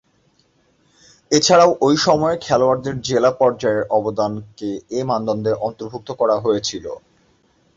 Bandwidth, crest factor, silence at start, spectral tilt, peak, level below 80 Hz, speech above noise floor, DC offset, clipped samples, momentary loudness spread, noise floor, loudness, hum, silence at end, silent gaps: 8 kHz; 18 dB; 1.3 s; -4.5 dB/octave; 0 dBFS; -54 dBFS; 43 dB; under 0.1%; under 0.1%; 15 LU; -60 dBFS; -18 LUFS; none; 0.8 s; none